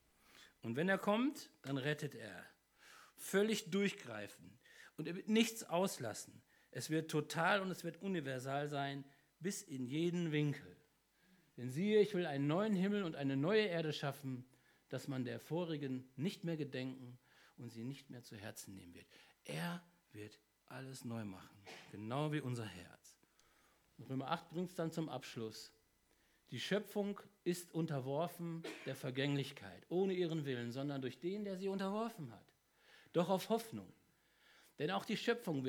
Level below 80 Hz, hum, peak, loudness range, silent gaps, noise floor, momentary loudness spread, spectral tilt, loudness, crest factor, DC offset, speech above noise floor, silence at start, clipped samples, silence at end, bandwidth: -86 dBFS; none; -18 dBFS; 9 LU; none; -76 dBFS; 19 LU; -5.5 dB/octave; -41 LUFS; 22 dB; under 0.1%; 35 dB; 0.35 s; under 0.1%; 0 s; over 20 kHz